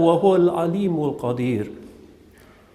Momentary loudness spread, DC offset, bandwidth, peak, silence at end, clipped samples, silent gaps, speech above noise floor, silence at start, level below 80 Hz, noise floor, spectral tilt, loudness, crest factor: 13 LU; under 0.1%; 12.5 kHz; -4 dBFS; 0.85 s; under 0.1%; none; 30 dB; 0 s; -58 dBFS; -50 dBFS; -8.5 dB/octave; -21 LUFS; 18 dB